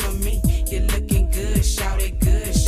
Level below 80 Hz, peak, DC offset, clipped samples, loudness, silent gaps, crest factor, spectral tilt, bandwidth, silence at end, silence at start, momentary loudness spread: -20 dBFS; -6 dBFS; under 0.1%; under 0.1%; -21 LUFS; none; 12 dB; -5 dB/octave; 15.5 kHz; 0 s; 0 s; 2 LU